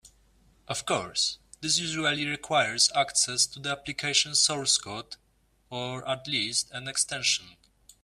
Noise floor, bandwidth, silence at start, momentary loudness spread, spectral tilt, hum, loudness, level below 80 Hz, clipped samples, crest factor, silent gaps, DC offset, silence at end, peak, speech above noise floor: -62 dBFS; 15.5 kHz; 0.05 s; 13 LU; -1 dB/octave; none; -26 LUFS; -64 dBFS; under 0.1%; 22 dB; none; under 0.1%; 0.5 s; -8 dBFS; 34 dB